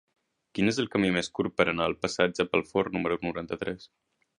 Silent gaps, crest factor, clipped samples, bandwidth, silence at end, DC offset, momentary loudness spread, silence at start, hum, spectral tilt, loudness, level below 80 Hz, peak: none; 24 dB; under 0.1%; 11 kHz; 0.55 s; under 0.1%; 8 LU; 0.55 s; none; -5 dB/octave; -28 LUFS; -58 dBFS; -6 dBFS